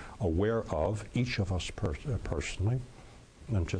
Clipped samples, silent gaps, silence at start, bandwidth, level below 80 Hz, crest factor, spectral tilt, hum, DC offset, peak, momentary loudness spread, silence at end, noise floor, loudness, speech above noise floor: under 0.1%; none; 0 s; 10.5 kHz; -44 dBFS; 16 dB; -6.5 dB/octave; none; under 0.1%; -18 dBFS; 6 LU; 0 s; -52 dBFS; -33 LUFS; 21 dB